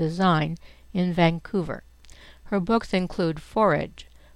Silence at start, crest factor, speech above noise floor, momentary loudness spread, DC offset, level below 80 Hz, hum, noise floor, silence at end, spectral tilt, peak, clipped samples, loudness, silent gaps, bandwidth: 0 s; 18 dB; 24 dB; 12 LU; under 0.1%; -46 dBFS; none; -48 dBFS; 0.3 s; -7.5 dB/octave; -8 dBFS; under 0.1%; -25 LUFS; none; 11 kHz